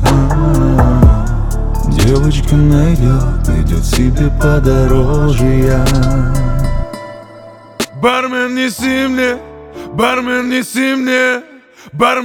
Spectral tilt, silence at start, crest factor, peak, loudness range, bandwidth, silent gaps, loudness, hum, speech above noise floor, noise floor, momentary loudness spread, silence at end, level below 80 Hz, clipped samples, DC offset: -6 dB/octave; 0 s; 12 dB; 0 dBFS; 4 LU; 17.5 kHz; none; -13 LUFS; none; 24 dB; -35 dBFS; 11 LU; 0 s; -16 dBFS; under 0.1%; under 0.1%